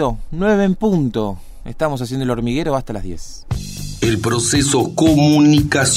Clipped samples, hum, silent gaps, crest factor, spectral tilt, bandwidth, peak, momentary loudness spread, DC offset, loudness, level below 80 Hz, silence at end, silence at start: under 0.1%; none; none; 14 dB; -5 dB/octave; 16 kHz; -2 dBFS; 16 LU; under 0.1%; -16 LUFS; -32 dBFS; 0 s; 0 s